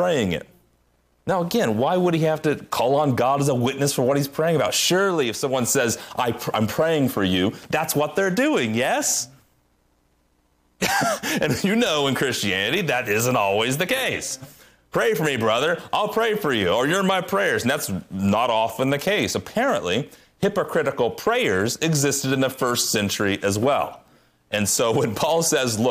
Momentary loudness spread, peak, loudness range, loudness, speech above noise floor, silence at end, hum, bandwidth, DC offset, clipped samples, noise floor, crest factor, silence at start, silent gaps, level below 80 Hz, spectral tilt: 5 LU; -8 dBFS; 2 LU; -21 LUFS; 43 dB; 0 s; none; 15.5 kHz; under 0.1%; under 0.1%; -64 dBFS; 14 dB; 0 s; none; -58 dBFS; -4 dB/octave